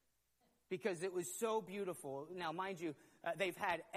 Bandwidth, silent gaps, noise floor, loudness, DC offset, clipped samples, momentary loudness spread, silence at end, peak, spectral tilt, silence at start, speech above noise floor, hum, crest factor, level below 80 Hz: 15 kHz; none; -80 dBFS; -43 LUFS; under 0.1%; under 0.1%; 8 LU; 0 s; -24 dBFS; -4 dB/octave; 0.7 s; 37 dB; none; 20 dB; -84 dBFS